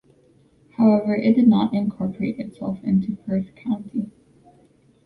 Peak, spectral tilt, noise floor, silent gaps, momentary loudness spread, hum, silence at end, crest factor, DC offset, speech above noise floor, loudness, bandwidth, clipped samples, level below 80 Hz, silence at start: -6 dBFS; -10 dB/octave; -57 dBFS; none; 13 LU; none; 0.95 s; 16 dB; under 0.1%; 36 dB; -21 LUFS; 4.6 kHz; under 0.1%; -58 dBFS; 0.8 s